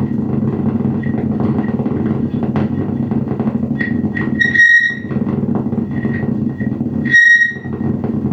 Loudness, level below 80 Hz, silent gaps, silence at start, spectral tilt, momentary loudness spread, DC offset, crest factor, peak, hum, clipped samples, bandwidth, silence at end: -15 LUFS; -46 dBFS; none; 0 s; -7 dB/octave; 11 LU; under 0.1%; 14 dB; -2 dBFS; none; under 0.1%; 8 kHz; 0 s